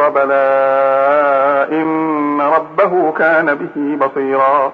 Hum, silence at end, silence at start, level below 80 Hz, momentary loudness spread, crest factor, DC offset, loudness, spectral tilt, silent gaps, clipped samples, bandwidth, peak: none; 0 s; 0 s; -64 dBFS; 5 LU; 12 dB; under 0.1%; -13 LUFS; -8 dB/octave; none; under 0.1%; 5 kHz; 0 dBFS